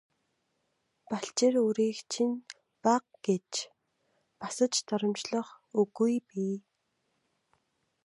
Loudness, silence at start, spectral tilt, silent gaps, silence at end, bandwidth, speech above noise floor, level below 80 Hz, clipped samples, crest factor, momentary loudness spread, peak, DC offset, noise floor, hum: -31 LUFS; 1.1 s; -4.5 dB/octave; none; 1.45 s; 11.5 kHz; 49 dB; -84 dBFS; under 0.1%; 20 dB; 12 LU; -12 dBFS; under 0.1%; -78 dBFS; none